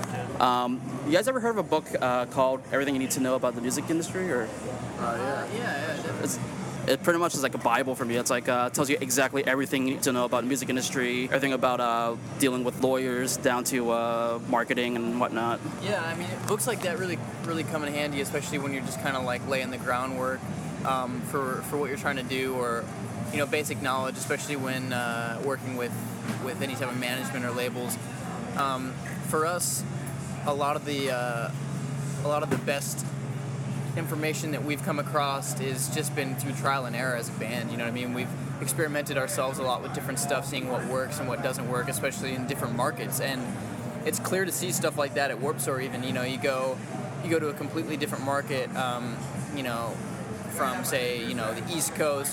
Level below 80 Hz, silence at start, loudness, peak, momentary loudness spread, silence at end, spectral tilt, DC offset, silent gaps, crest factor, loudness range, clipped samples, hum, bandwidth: -62 dBFS; 0 s; -29 LUFS; -8 dBFS; 7 LU; 0 s; -4.5 dB/octave; under 0.1%; none; 22 dB; 4 LU; under 0.1%; none; 17.5 kHz